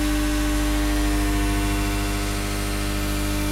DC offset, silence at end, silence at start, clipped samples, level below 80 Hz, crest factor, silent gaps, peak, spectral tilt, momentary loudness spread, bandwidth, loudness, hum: under 0.1%; 0 s; 0 s; under 0.1%; -26 dBFS; 12 dB; none; -10 dBFS; -4.5 dB/octave; 3 LU; 16 kHz; -24 LUFS; 50 Hz at -25 dBFS